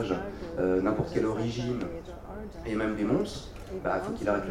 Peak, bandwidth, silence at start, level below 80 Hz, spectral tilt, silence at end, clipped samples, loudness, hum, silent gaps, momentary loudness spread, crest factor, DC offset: -14 dBFS; 15.5 kHz; 0 s; -46 dBFS; -7 dB/octave; 0 s; under 0.1%; -31 LUFS; none; none; 14 LU; 16 dB; under 0.1%